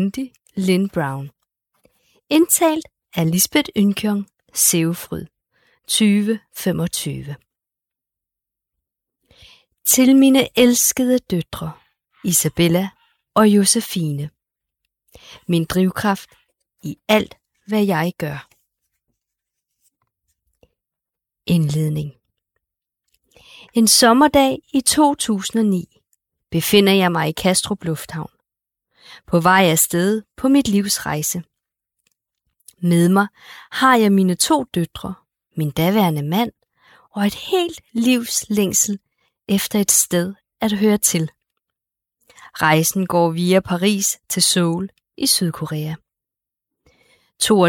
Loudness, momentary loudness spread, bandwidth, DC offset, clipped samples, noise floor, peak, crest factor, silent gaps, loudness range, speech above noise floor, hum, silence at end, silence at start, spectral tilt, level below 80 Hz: -17 LUFS; 16 LU; 19 kHz; under 0.1%; under 0.1%; -86 dBFS; -2 dBFS; 18 dB; none; 8 LU; 69 dB; none; 0 s; 0 s; -4 dB/octave; -52 dBFS